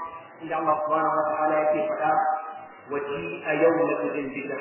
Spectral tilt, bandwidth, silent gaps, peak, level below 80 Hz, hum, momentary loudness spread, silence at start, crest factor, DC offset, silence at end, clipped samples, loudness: -9.5 dB/octave; 3.2 kHz; none; -10 dBFS; -68 dBFS; none; 11 LU; 0 s; 16 dB; under 0.1%; 0 s; under 0.1%; -25 LUFS